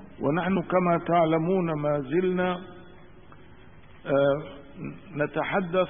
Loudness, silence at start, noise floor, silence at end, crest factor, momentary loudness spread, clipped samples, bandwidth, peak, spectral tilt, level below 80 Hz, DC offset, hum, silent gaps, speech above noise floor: -26 LUFS; 0 s; -51 dBFS; 0 s; 16 dB; 17 LU; under 0.1%; 3.7 kHz; -10 dBFS; -11.5 dB/octave; -56 dBFS; 0.3%; none; none; 26 dB